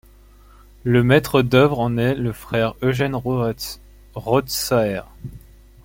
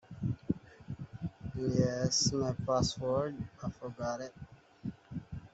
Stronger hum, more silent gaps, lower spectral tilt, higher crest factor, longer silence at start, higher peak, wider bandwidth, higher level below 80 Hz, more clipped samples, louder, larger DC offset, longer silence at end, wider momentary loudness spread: neither; neither; about the same, -6 dB/octave vs -5 dB/octave; about the same, 18 dB vs 20 dB; first, 0.85 s vs 0.1 s; first, -2 dBFS vs -16 dBFS; first, 16.5 kHz vs 8.2 kHz; first, -44 dBFS vs -56 dBFS; neither; first, -19 LUFS vs -35 LUFS; neither; first, 0.45 s vs 0.05 s; about the same, 18 LU vs 17 LU